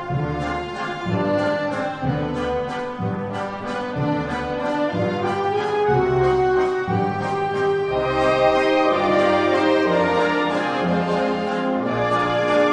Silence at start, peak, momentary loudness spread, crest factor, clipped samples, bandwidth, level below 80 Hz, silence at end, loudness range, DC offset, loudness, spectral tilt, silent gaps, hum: 0 s; -4 dBFS; 8 LU; 16 dB; under 0.1%; 10 kHz; -44 dBFS; 0 s; 6 LU; under 0.1%; -21 LUFS; -6.5 dB/octave; none; none